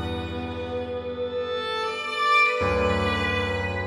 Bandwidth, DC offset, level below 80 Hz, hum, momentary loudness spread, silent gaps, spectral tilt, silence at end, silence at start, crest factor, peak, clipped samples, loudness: 13 kHz; under 0.1%; -42 dBFS; none; 12 LU; none; -5 dB/octave; 0 s; 0 s; 16 dB; -10 dBFS; under 0.1%; -24 LUFS